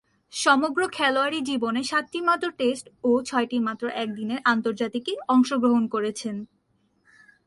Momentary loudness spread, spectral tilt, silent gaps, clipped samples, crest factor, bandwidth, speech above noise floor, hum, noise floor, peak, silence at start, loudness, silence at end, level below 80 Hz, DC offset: 8 LU; -3.5 dB/octave; none; under 0.1%; 18 dB; 11.5 kHz; 44 dB; none; -68 dBFS; -6 dBFS; 0.35 s; -24 LUFS; 1 s; -68 dBFS; under 0.1%